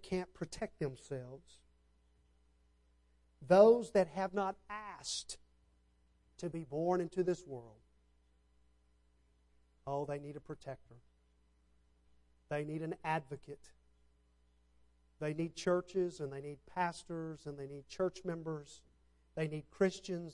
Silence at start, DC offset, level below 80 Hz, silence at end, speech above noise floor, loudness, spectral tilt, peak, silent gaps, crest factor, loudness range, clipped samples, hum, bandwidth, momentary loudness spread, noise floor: 0 s; under 0.1%; -68 dBFS; 0 s; 35 dB; -37 LUFS; -5.5 dB/octave; -14 dBFS; none; 26 dB; 15 LU; under 0.1%; none; 11.5 kHz; 16 LU; -72 dBFS